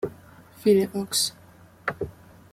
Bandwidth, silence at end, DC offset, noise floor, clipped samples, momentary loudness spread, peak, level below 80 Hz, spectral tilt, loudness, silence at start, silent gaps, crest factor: 16 kHz; 0.4 s; under 0.1%; -49 dBFS; under 0.1%; 15 LU; -8 dBFS; -58 dBFS; -3.5 dB/octave; -25 LUFS; 0 s; none; 18 dB